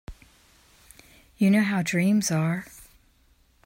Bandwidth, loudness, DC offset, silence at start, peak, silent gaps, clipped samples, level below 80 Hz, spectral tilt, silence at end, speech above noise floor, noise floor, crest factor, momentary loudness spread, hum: 16 kHz; -24 LUFS; under 0.1%; 0.1 s; -12 dBFS; none; under 0.1%; -54 dBFS; -5.5 dB/octave; 0.8 s; 39 dB; -62 dBFS; 16 dB; 10 LU; none